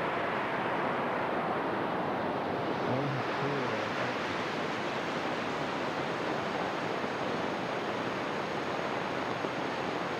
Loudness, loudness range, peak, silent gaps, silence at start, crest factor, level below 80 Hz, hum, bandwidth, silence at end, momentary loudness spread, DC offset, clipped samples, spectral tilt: -33 LUFS; 1 LU; -18 dBFS; none; 0 s; 14 dB; -68 dBFS; none; 14.5 kHz; 0 s; 2 LU; under 0.1%; under 0.1%; -5.5 dB/octave